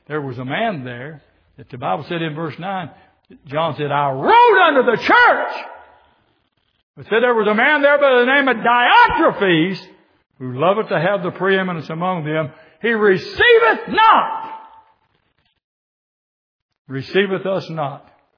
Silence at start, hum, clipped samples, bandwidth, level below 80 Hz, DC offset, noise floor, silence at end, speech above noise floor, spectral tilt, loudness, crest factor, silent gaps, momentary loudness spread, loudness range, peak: 0.1 s; none; under 0.1%; 5.4 kHz; -54 dBFS; under 0.1%; -65 dBFS; 0.4 s; 49 dB; -7 dB/octave; -15 LUFS; 18 dB; 6.83-6.94 s, 15.64-16.69 s, 16.79-16.85 s; 17 LU; 11 LU; 0 dBFS